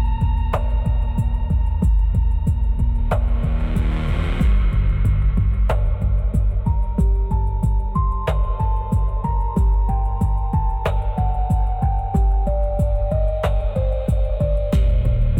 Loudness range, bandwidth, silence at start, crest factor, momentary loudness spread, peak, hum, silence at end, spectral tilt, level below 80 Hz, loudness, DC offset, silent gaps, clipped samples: 1 LU; 4.1 kHz; 0 s; 8 dB; 3 LU; -8 dBFS; none; 0 s; -9 dB/octave; -18 dBFS; -21 LUFS; under 0.1%; none; under 0.1%